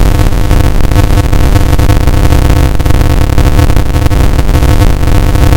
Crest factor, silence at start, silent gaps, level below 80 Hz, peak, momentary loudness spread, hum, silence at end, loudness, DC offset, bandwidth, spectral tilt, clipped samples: 4 dB; 0 s; none; -8 dBFS; 0 dBFS; 2 LU; none; 0 s; -9 LUFS; under 0.1%; 17.5 kHz; -6.5 dB/octave; 1%